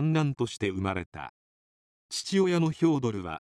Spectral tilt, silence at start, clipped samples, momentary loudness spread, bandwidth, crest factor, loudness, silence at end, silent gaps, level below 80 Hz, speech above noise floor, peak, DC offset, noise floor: -6 dB/octave; 0 s; under 0.1%; 13 LU; 12.5 kHz; 16 dB; -28 LUFS; 0.1 s; 1.06-1.12 s, 1.29-2.09 s; -64 dBFS; over 62 dB; -12 dBFS; under 0.1%; under -90 dBFS